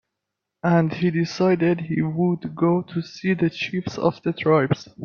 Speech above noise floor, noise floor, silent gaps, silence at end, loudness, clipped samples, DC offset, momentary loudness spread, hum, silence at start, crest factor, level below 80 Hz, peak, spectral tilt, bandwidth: 61 dB; -82 dBFS; none; 0 s; -22 LUFS; under 0.1%; under 0.1%; 7 LU; none; 0.65 s; 18 dB; -60 dBFS; -4 dBFS; -7.5 dB/octave; 6.8 kHz